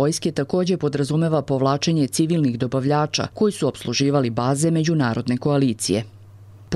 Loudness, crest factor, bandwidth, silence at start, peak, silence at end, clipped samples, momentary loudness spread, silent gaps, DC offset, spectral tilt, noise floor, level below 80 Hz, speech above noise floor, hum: -21 LUFS; 14 dB; 13 kHz; 0 s; -6 dBFS; 0 s; under 0.1%; 3 LU; none; under 0.1%; -5.5 dB/octave; -44 dBFS; -56 dBFS; 23 dB; none